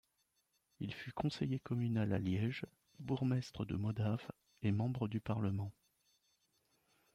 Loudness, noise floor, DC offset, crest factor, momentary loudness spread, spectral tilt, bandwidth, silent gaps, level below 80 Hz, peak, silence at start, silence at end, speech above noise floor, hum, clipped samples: -40 LUFS; -81 dBFS; under 0.1%; 16 dB; 10 LU; -8 dB/octave; 10.5 kHz; none; -68 dBFS; -24 dBFS; 0.8 s; 1.45 s; 43 dB; none; under 0.1%